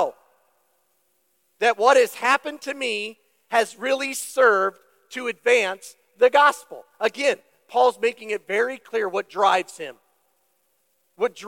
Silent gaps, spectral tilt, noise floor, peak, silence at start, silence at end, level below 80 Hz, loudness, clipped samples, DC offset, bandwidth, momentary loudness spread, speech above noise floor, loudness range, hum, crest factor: none; -1.5 dB/octave; -69 dBFS; -4 dBFS; 0 s; 0 s; -88 dBFS; -22 LUFS; under 0.1%; under 0.1%; 16.5 kHz; 14 LU; 48 dB; 3 LU; none; 20 dB